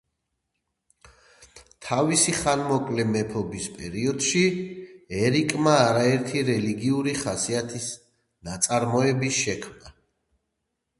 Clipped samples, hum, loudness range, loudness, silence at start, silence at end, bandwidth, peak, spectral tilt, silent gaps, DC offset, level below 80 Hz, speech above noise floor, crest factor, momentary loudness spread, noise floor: under 0.1%; none; 3 LU; -24 LUFS; 1.4 s; 1.1 s; 12 kHz; -4 dBFS; -4 dB/octave; none; under 0.1%; -56 dBFS; 56 dB; 22 dB; 14 LU; -80 dBFS